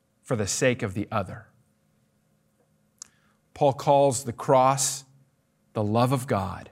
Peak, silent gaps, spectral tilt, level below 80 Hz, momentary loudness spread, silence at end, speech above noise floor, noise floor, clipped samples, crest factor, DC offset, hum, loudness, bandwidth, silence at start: -6 dBFS; none; -4.5 dB/octave; -66 dBFS; 11 LU; 0.05 s; 44 dB; -68 dBFS; under 0.1%; 20 dB; under 0.1%; none; -25 LUFS; 16 kHz; 0.3 s